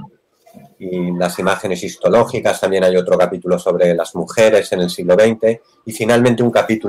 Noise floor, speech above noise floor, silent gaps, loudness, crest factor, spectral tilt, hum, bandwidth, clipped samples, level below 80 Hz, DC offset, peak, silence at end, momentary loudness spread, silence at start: -49 dBFS; 34 dB; none; -15 LUFS; 12 dB; -5.5 dB/octave; none; 16 kHz; under 0.1%; -54 dBFS; under 0.1%; -2 dBFS; 0 s; 9 LU; 0 s